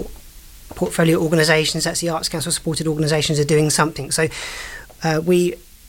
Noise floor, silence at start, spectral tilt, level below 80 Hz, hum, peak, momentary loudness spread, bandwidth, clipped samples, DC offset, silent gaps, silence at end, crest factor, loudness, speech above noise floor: -40 dBFS; 0 s; -4 dB/octave; -42 dBFS; none; -2 dBFS; 12 LU; 17 kHz; under 0.1%; under 0.1%; none; 0 s; 16 dB; -19 LUFS; 22 dB